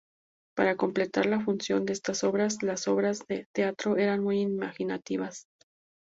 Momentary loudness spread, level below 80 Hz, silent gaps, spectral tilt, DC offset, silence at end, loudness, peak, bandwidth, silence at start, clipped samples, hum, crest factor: 7 LU; -70 dBFS; 3.46-3.54 s; -5 dB/octave; under 0.1%; 0.7 s; -29 LUFS; -10 dBFS; 7.8 kHz; 0.55 s; under 0.1%; none; 20 dB